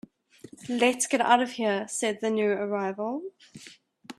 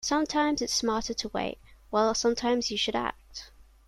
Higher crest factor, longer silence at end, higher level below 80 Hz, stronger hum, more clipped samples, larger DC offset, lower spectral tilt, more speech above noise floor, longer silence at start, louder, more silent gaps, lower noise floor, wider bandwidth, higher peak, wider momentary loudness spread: first, 22 dB vs 16 dB; second, 0.05 s vs 0.25 s; second, -76 dBFS vs -52 dBFS; neither; neither; neither; about the same, -3 dB/octave vs -2.5 dB/octave; first, 24 dB vs 20 dB; first, 0.45 s vs 0 s; about the same, -26 LUFS vs -28 LUFS; neither; about the same, -51 dBFS vs -48 dBFS; about the same, 13.5 kHz vs 14 kHz; first, -6 dBFS vs -12 dBFS; first, 21 LU vs 15 LU